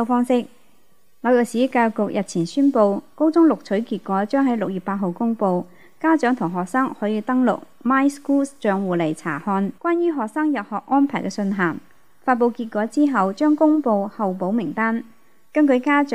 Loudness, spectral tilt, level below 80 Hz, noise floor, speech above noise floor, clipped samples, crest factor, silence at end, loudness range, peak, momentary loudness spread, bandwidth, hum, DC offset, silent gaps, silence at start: -21 LUFS; -6.5 dB/octave; -70 dBFS; -61 dBFS; 42 dB; under 0.1%; 16 dB; 0 s; 2 LU; -4 dBFS; 7 LU; 12.5 kHz; none; 0.4%; none; 0 s